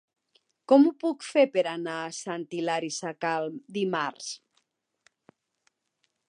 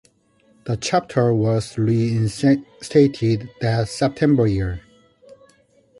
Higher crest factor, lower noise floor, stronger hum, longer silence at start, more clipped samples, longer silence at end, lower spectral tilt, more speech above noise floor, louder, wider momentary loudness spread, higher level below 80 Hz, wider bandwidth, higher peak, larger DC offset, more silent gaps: first, 22 dB vs 16 dB; first, -77 dBFS vs -59 dBFS; neither; about the same, 0.7 s vs 0.65 s; neither; first, 1.95 s vs 0.65 s; second, -4.5 dB/octave vs -7 dB/octave; first, 50 dB vs 40 dB; second, -27 LUFS vs -20 LUFS; first, 14 LU vs 8 LU; second, -86 dBFS vs -44 dBFS; about the same, 10.5 kHz vs 11.5 kHz; second, -8 dBFS vs -4 dBFS; neither; neither